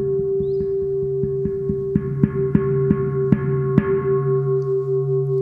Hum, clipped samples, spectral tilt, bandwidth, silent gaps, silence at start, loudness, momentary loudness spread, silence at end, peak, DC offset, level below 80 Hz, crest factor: none; under 0.1%; -12 dB/octave; 3 kHz; none; 0 s; -20 LUFS; 4 LU; 0 s; -2 dBFS; under 0.1%; -42 dBFS; 18 dB